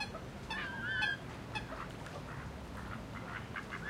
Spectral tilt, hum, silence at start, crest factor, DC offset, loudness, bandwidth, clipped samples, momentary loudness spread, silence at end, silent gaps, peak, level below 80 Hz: -4.5 dB/octave; none; 0 s; 20 dB; under 0.1%; -41 LUFS; 16 kHz; under 0.1%; 11 LU; 0 s; none; -22 dBFS; -54 dBFS